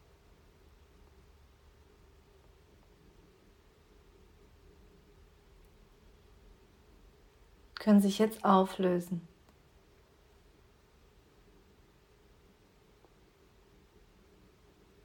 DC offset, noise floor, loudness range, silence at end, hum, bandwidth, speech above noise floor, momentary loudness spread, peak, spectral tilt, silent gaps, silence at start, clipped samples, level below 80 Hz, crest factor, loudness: under 0.1%; -64 dBFS; 9 LU; 5.8 s; none; 18 kHz; 36 dB; 16 LU; -12 dBFS; -6.5 dB/octave; none; 7.8 s; under 0.1%; -64 dBFS; 26 dB; -29 LUFS